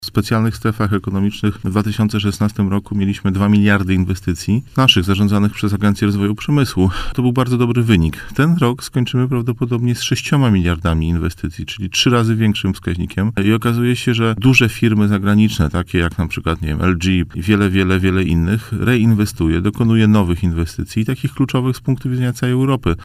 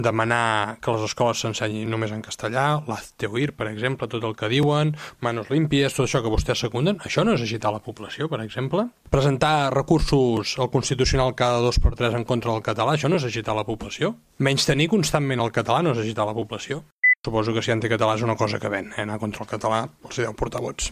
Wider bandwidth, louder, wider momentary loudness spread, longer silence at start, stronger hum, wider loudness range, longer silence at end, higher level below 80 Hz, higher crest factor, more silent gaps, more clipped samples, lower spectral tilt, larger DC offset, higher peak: about the same, 15.5 kHz vs 15 kHz; first, -16 LUFS vs -23 LUFS; second, 6 LU vs 9 LU; about the same, 0 s vs 0 s; neither; about the same, 2 LU vs 3 LU; about the same, 0 s vs 0 s; about the same, -32 dBFS vs -36 dBFS; about the same, 16 dB vs 18 dB; second, none vs 16.92-17.02 s, 17.16-17.20 s; neither; about the same, -6 dB/octave vs -5 dB/octave; neither; first, 0 dBFS vs -4 dBFS